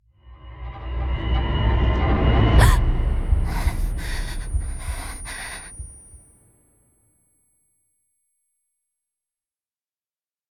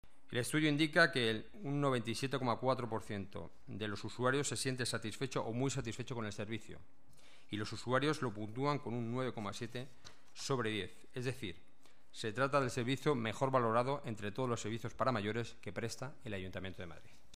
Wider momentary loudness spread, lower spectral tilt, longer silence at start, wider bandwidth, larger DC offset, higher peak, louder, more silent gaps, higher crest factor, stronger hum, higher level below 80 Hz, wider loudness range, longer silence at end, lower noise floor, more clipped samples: first, 20 LU vs 13 LU; about the same, -5.5 dB/octave vs -5 dB/octave; about the same, 0.25 s vs 0.3 s; about the same, 14.5 kHz vs 15.5 kHz; second, under 0.1% vs 0.4%; first, -2 dBFS vs -16 dBFS; first, -23 LUFS vs -38 LUFS; neither; about the same, 22 dB vs 22 dB; neither; first, -24 dBFS vs -68 dBFS; first, 17 LU vs 5 LU; first, 4.35 s vs 0.35 s; first, under -90 dBFS vs -67 dBFS; neither